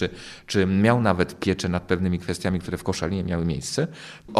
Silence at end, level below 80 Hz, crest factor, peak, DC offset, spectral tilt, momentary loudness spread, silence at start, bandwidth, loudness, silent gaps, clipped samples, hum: 0 s; -46 dBFS; 20 dB; -4 dBFS; under 0.1%; -6 dB/octave; 9 LU; 0 s; 14 kHz; -24 LUFS; none; under 0.1%; none